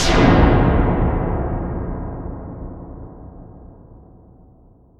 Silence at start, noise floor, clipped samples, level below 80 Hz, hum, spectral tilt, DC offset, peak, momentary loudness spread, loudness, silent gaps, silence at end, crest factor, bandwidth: 0 s; -49 dBFS; under 0.1%; -24 dBFS; none; -6.5 dB/octave; under 0.1%; 0 dBFS; 25 LU; -18 LUFS; none; 1.05 s; 18 dB; 11 kHz